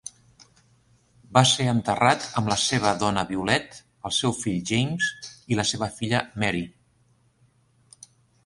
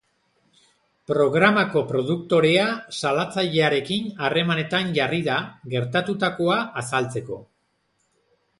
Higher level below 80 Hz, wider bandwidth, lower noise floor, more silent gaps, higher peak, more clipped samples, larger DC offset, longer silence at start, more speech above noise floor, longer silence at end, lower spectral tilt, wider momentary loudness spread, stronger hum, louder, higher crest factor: first, -54 dBFS vs -62 dBFS; about the same, 11.5 kHz vs 11.5 kHz; second, -63 dBFS vs -70 dBFS; neither; about the same, -2 dBFS vs -2 dBFS; neither; neither; second, 0.05 s vs 1.1 s; second, 40 dB vs 48 dB; first, 1.75 s vs 1.15 s; second, -4 dB/octave vs -5.5 dB/octave; about the same, 10 LU vs 9 LU; neither; about the same, -24 LUFS vs -22 LUFS; about the same, 24 dB vs 20 dB